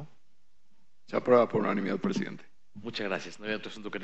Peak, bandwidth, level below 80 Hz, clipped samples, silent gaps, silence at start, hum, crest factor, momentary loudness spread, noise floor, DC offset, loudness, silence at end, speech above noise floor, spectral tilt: -10 dBFS; 8.4 kHz; -78 dBFS; under 0.1%; none; 0 s; none; 22 dB; 15 LU; -75 dBFS; 0.5%; -30 LUFS; 0 s; 46 dB; -6 dB/octave